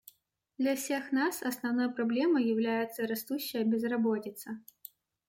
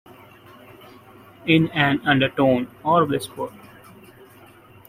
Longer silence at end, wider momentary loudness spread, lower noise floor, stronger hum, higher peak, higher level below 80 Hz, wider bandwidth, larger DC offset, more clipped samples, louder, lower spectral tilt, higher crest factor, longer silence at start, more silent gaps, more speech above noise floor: second, 0.7 s vs 1.4 s; about the same, 15 LU vs 13 LU; first, -71 dBFS vs -48 dBFS; neither; second, -18 dBFS vs -2 dBFS; second, -80 dBFS vs -56 dBFS; about the same, 16.5 kHz vs 16 kHz; neither; neither; second, -31 LUFS vs -20 LUFS; second, -4.5 dB/octave vs -6.5 dB/octave; second, 14 dB vs 20 dB; second, 0.6 s vs 1.45 s; neither; first, 40 dB vs 28 dB